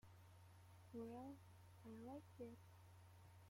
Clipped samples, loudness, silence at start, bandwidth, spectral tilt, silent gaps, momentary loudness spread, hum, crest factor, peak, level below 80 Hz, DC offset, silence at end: under 0.1%; -60 LUFS; 0.05 s; 16.5 kHz; -7 dB/octave; none; 12 LU; none; 16 dB; -44 dBFS; -84 dBFS; under 0.1%; 0 s